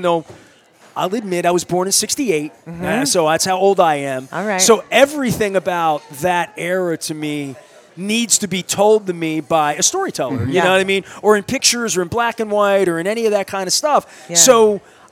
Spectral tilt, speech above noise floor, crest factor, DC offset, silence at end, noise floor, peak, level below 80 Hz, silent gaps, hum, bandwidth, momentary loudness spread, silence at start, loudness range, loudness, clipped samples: -3 dB/octave; 32 dB; 16 dB; under 0.1%; 0.3 s; -48 dBFS; 0 dBFS; -54 dBFS; none; none; over 20 kHz; 9 LU; 0 s; 4 LU; -16 LUFS; under 0.1%